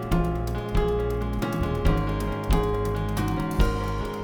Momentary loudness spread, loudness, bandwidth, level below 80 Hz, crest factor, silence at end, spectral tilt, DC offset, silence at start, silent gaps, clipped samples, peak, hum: 3 LU; -26 LUFS; 19 kHz; -28 dBFS; 18 dB; 0 s; -7 dB/octave; under 0.1%; 0 s; none; under 0.1%; -8 dBFS; none